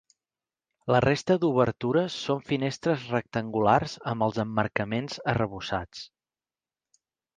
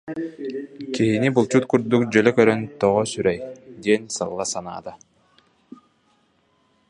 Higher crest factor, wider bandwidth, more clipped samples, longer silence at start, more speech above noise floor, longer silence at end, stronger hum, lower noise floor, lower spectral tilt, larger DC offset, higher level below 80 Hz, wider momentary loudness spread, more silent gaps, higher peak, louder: about the same, 22 dB vs 20 dB; second, 9.6 kHz vs 11 kHz; neither; first, 0.85 s vs 0.05 s; first, over 64 dB vs 43 dB; second, 1.3 s vs 1.95 s; neither; first, under -90 dBFS vs -64 dBFS; about the same, -6.5 dB/octave vs -5.5 dB/octave; neither; about the same, -56 dBFS vs -58 dBFS; second, 9 LU vs 15 LU; neither; second, -6 dBFS vs -2 dBFS; second, -27 LUFS vs -21 LUFS